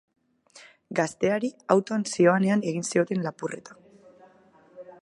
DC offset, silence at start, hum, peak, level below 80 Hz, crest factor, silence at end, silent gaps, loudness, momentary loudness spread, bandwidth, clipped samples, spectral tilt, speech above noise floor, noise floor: under 0.1%; 0.55 s; none; -4 dBFS; -72 dBFS; 22 dB; 0.1 s; none; -25 LUFS; 11 LU; 11.5 kHz; under 0.1%; -5.5 dB/octave; 32 dB; -57 dBFS